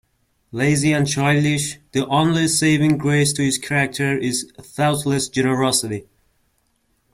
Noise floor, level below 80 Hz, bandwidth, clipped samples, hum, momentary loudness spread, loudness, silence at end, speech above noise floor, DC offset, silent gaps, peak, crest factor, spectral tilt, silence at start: -66 dBFS; -52 dBFS; 15 kHz; under 0.1%; none; 7 LU; -19 LUFS; 1.1 s; 47 dB; under 0.1%; none; -4 dBFS; 16 dB; -4.5 dB/octave; 0.55 s